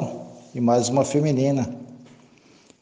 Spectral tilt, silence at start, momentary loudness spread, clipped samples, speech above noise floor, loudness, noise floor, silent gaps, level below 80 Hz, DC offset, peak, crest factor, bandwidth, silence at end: -6.5 dB/octave; 0 s; 19 LU; under 0.1%; 33 dB; -22 LUFS; -54 dBFS; none; -62 dBFS; under 0.1%; -8 dBFS; 16 dB; 10 kHz; 0.75 s